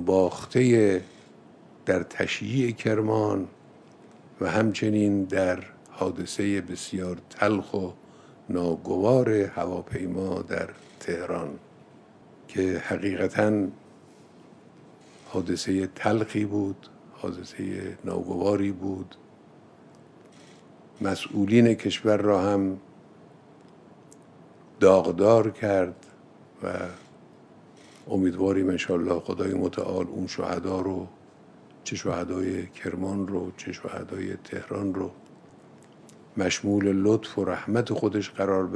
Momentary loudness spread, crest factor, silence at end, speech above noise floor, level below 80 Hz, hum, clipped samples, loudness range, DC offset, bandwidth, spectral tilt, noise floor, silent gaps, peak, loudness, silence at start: 14 LU; 22 dB; 0 s; 27 dB; -64 dBFS; none; under 0.1%; 7 LU; under 0.1%; 11 kHz; -6 dB/octave; -52 dBFS; none; -4 dBFS; -26 LUFS; 0 s